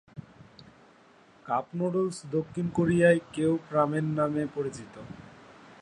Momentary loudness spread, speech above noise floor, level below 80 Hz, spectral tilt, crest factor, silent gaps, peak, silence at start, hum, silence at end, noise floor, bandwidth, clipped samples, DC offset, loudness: 22 LU; 30 dB; -62 dBFS; -7 dB/octave; 20 dB; none; -8 dBFS; 0.15 s; none; 0.1 s; -58 dBFS; 11 kHz; under 0.1%; under 0.1%; -28 LUFS